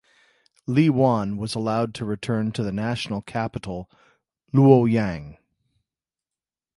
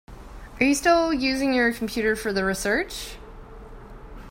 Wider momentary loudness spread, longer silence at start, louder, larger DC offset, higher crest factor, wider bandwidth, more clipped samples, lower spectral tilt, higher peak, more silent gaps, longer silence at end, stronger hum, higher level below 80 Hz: second, 15 LU vs 24 LU; first, 0.7 s vs 0.1 s; about the same, -22 LUFS vs -23 LUFS; neither; about the same, 22 dB vs 18 dB; second, 11.5 kHz vs 16 kHz; neither; first, -7.5 dB/octave vs -3.5 dB/octave; first, -2 dBFS vs -6 dBFS; neither; first, 1.45 s vs 0 s; neither; second, -52 dBFS vs -44 dBFS